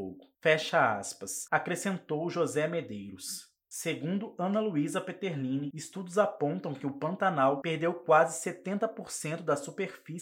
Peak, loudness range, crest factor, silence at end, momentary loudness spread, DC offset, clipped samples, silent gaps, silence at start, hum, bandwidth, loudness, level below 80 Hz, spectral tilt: -10 dBFS; 4 LU; 20 dB; 0 s; 12 LU; under 0.1%; under 0.1%; none; 0 s; none; 17 kHz; -31 LUFS; -80 dBFS; -4.5 dB/octave